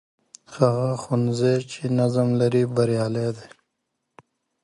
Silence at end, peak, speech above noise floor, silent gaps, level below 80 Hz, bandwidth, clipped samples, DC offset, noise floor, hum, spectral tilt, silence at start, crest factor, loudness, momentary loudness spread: 1.15 s; -4 dBFS; 56 dB; none; -62 dBFS; 11 kHz; under 0.1%; under 0.1%; -78 dBFS; none; -7.5 dB/octave; 0.5 s; 20 dB; -22 LUFS; 7 LU